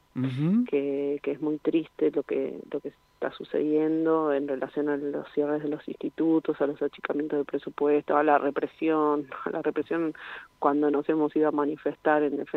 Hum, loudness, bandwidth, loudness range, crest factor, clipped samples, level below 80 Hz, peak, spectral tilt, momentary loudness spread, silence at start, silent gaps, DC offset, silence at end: none; -27 LUFS; 4.4 kHz; 2 LU; 20 dB; under 0.1%; -72 dBFS; -6 dBFS; -9 dB/octave; 9 LU; 0.15 s; none; under 0.1%; 0 s